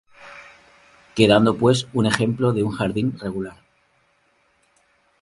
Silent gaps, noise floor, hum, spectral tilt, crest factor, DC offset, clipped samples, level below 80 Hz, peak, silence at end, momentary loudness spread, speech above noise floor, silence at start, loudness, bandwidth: none; -63 dBFS; none; -6 dB/octave; 22 dB; under 0.1%; under 0.1%; -52 dBFS; 0 dBFS; 1.7 s; 25 LU; 44 dB; 0.2 s; -20 LUFS; 11.5 kHz